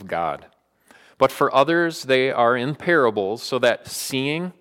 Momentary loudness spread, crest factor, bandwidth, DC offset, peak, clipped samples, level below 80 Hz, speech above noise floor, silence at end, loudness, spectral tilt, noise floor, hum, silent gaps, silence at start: 8 LU; 16 dB; 17 kHz; under 0.1%; -4 dBFS; under 0.1%; -64 dBFS; 34 dB; 0.1 s; -20 LUFS; -4.5 dB/octave; -55 dBFS; none; none; 0 s